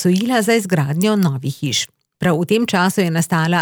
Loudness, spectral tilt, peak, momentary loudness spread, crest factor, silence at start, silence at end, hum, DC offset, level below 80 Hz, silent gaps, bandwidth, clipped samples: -17 LUFS; -5 dB/octave; -4 dBFS; 5 LU; 14 dB; 0 s; 0 s; none; under 0.1%; -60 dBFS; none; over 20 kHz; under 0.1%